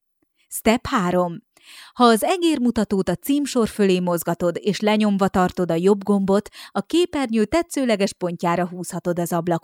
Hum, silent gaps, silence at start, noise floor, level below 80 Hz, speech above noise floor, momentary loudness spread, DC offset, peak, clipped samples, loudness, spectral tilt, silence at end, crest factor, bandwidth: none; none; 0.5 s; -67 dBFS; -50 dBFS; 47 dB; 6 LU; under 0.1%; -4 dBFS; under 0.1%; -21 LUFS; -5.5 dB/octave; 0.05 s; 18 dB; 17 kHz